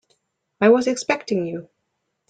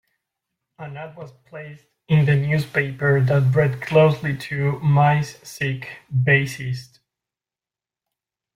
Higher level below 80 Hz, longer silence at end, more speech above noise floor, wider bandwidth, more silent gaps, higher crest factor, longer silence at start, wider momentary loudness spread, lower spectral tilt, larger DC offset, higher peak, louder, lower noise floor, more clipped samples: second, -66 dBFS vs -56 dBFS; second, 0.65 s vs 1.7 s; second, 56 dB vs over 70 dB; second, 9.2 kHz vs 14 kHz; neither; about the same, 18 dB vs 18 dB; second, 0.6 s vs 0.8 s; second, 13 LU vs 21 LU; second, -5 dB/octave vs -7.5 dB/octave; neither; about the same, -4 dBFS vs -4 dBFS; about the same, -20 LUFS vs -20 LUFS; second, -75 dBFS vs under -90 dBFS; neither